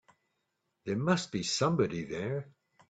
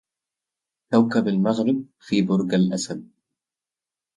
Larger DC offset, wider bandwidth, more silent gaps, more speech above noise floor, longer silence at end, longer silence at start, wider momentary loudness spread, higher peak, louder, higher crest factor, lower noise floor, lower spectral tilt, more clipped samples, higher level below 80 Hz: neither; second, 9.2 kHz vs 11 kHz; neither; second, 50 dB vs 69 dB; second, 0.4 s vs 1.15 s; about the same, 0.85 s vs 0.9 s; about the same, 9 LU vs 8 LU; second, -14 dBFS vs -4 dBFS; second, -32 LUFS vs -22 LUFS; about the same, 20 dB vs 20 dB; second, -81 dBFS vs -90 dBFS; second, -5 dB/octave vs -6.5 dB/octave; neither; about the same, -66 dBFS vs -66 dBFS